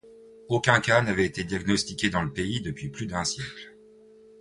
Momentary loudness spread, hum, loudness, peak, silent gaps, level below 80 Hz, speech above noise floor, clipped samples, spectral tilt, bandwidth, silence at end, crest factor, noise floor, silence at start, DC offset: 13 LU; none; -26 LUFS; -4 dBFS; none; -50 dBFS; 27 dB; under 0.1%; -4.5 dB/octave; 11.5 kHz; 0.7 s; 22 dB; -53 dBFS; 0.05 s; under 0.1%